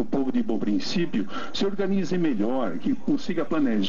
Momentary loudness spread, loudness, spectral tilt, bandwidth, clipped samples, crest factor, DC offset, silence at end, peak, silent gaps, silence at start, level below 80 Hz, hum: 3 LU; -26 LUFS; -6.5 dB/octave; 7.6 kHz; under 0.1%; 12 dB; 4%; 0 s; -12 dBFS; none; 0 s; -58 dBFS; none